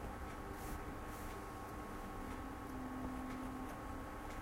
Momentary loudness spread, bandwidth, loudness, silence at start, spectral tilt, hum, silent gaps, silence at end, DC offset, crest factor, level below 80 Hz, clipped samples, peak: 3 LU; 16 kHz; -48 LUFS; 0 s; -5.5 dB/octave; none; none; 0 s; under 0.1%; 14 dB; -52 dBFS; under 0.1%; -32 dBFS